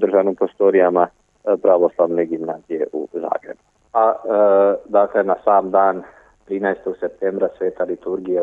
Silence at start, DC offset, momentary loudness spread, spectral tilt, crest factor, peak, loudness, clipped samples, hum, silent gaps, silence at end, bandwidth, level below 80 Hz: 0 s; under 0.1%; 11 LU; -9 dB/octave; 16 dB; -2 dBFS; -18 LUFS; under 0.1%; none; none; 0 s; 3.8 kHz; -62 dBFS